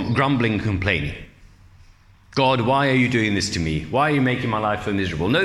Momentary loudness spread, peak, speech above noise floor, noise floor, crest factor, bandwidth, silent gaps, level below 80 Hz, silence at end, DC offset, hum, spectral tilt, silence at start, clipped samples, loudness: 6 LU; -4 dBFS; 30 dB; -50 dBFS; 18 dB; 12.5 kHz; none; -44 dBFS; 0 s; under 0.1%; none; -5.5 dB/octave; 0 s; under 0.1%; -21 LUFS